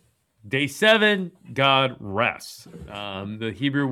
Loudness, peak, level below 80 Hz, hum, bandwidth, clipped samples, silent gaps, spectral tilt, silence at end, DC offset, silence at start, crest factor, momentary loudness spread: -22 LUFS; -4 dBFS; -58 dBFS; none; 15.5 kHz; under 0.1%; none; -4.5 dB/octave; 0 s; under 0.1%; 0.45 s; 20 dB; 18 LU